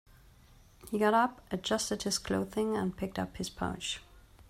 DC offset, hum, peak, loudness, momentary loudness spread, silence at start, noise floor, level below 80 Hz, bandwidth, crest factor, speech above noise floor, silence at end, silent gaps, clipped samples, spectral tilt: under 0.1%; none; -14 dBFS; -33 LUFS; 10 LU; 0.8 s; -59 dBFS; -56 dBFS; 16 kHz; 20 dB; 27 dB; 0.1 s; none; under 0.1%; -4 dB/octave